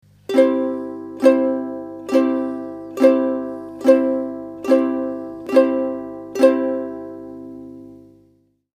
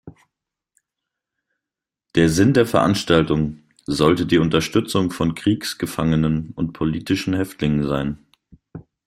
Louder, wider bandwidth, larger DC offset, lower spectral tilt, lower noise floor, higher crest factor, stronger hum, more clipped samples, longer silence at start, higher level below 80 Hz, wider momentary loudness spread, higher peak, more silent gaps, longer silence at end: about the same, -19 LUFS vs -20 LUFS; second, 14.5 kHz vs 16 kHz; neither; about the same, -6 dB/octave vs -6 dB/octave; second, -59 dBFS vs -87 dBFS; about the same, 20 dB vs 20 dB; first, 50 Hz at -55 dBFS vs none; neither; first, 0.3 s vs 0.05 s; second, -64 dBFS vs -44 dBFS; first, 16 LU vs 9 LU; about the same, 0 dBFS vs -2 dBFS; neither; first, 0.8 s vs 0.25 s